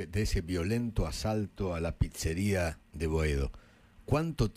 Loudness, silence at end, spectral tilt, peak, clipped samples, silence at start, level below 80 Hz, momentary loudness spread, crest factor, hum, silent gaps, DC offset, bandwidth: -33 LUFS; 0.05 s; -6 dB/octave; -14 dBFS; under 0.1%; 0 s; -40 dBFS; 5 LU; 18 dB; none; none; under 0.1%; 16 kHz